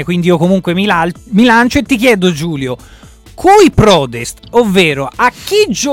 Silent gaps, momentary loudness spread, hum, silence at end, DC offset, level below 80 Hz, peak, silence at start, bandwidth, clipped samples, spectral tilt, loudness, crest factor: none; 11 LU; none; 0 s; under 0.1%; -34 dBFS; 0 dBFS; 0 s; 17 kHz; under 0.1%; -5 dB/octave; -10 LUFS; 10 dB